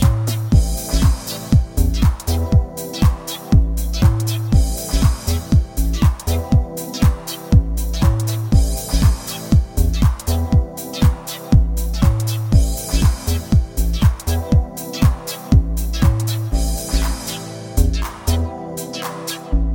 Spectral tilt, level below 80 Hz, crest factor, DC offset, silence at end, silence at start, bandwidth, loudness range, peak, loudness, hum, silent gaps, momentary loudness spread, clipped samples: -6 dB/octave; -20 dBFS; 16 dB; under 0.1%; 0 s; 0 s; 17 kHz; 2 LU; 0 dBFS; -19 LUFS; none; none; 8 LU; under 0.1%